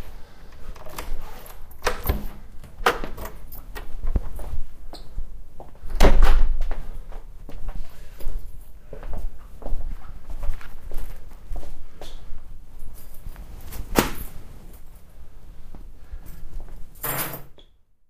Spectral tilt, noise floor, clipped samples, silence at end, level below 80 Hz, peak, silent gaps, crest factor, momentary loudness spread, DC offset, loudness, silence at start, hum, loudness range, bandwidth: -4.5 dB/octave; -51 dBFS; under 0.1%; 0.45 s; -26 dBFS; 0 dBFS; none; 22 dB; 23 LU; under 0.1%; -29 LUFS; 0 s; none; 12 LU; 15.5 kHz